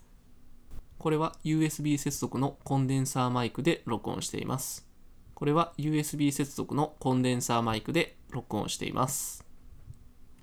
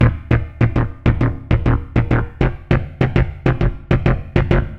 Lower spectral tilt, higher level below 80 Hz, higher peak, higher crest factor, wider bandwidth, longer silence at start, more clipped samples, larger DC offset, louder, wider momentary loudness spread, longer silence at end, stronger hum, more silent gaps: second, -5 dB/octave vs -9.5 dB/octave; second, -52 dBFS vs -24 dBFS; second, -12 dBFS vs -2 dBFS; about the same, 18 dB vs 16 dB; first, 20 kHz vs 5.8 kHz; first, 0.15 s vs 0 s; neither; neither; second, -30 LUFS vs -18 LUFS; first, 6 LU vs 3 LU; about the same, 0.1 s vs 0 s; neither; neither